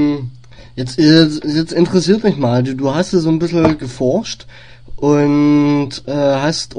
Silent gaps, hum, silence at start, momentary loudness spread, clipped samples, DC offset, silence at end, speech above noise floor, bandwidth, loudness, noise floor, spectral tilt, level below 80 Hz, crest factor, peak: none; none; 0 s; 12 LU; under 0.1%; 0.9%; 0 s; 21 dB; 10 kHz; -14 LUFS; -35 dBFS; -6 dB/octave; -42 dBFS; 14 dB; 0 dBFS